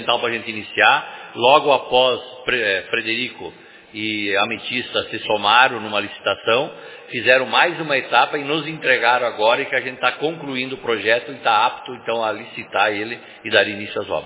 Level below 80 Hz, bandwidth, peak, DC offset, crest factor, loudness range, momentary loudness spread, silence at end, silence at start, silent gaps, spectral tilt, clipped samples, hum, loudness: -60 dBFS; 4 kHz; 0 dBFS; under 0.1%; 20 dB; 3 LU; 12 LU; 0 s; 0 s; none; -7 dB/octave; under 0.1%; none; -18 LUFS